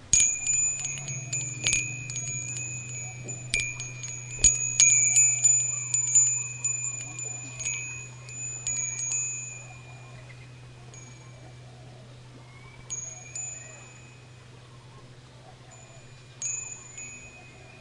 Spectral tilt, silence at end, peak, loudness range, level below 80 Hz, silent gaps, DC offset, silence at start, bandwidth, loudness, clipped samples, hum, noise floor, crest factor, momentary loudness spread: -0.5 dB/octave; 0 s; -4 dBFS; 21 LU; -52 dBFS; none; under 0.1%; 0 s; 11.5 kHz; -25 LUFS; under 0.1%; none; -49 dBFS; 26 dB; 26 LU